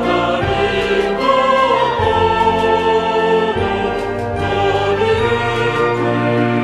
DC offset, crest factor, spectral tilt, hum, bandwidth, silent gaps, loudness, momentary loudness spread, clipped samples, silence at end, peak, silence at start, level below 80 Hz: under 0.1%; 14 dB; -6 dB/octave; none; 11.5 kHz; none; -15 LUFS; 5 LU; under 0.1%; 0 s; -2 dBFS; 0 s; -36 dBFS